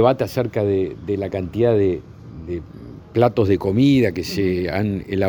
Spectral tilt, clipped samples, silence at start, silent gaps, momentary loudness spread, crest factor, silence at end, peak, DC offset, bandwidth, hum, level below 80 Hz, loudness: -7.5 dB/octave; under 0.1%; 0 s; none; 14 LU; 18 dB; 0 s; -2 dBFS; under 0.1%; over 20 kHz; none; -48 dBFS; -20 LUFS